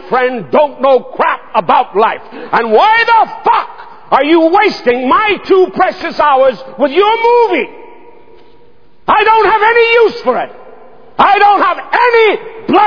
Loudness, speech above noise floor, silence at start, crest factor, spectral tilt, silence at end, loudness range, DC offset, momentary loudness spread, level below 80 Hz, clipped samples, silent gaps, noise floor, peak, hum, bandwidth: -10 LUFS; 38 dB; 0 s; 10 dB; -5.5 dB/octave; 0 s; 2 LU; 2%; 8 LU; -52 dBFS; 0.3%; none; -47 dBFS; 0 dBFS; none; 5.4 kHz